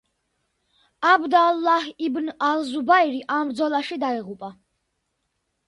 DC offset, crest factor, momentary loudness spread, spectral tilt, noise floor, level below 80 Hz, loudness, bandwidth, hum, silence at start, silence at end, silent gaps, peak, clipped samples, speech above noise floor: under 0.1%; 20 dB; 10 LU; -4 dB/octave; -75 dBFS; -70 dBFS; -21 LUFS; 11.5 kHz; none; 1 s; 1.15 s; none; -4 dBFS; under 0.1%; 54 dB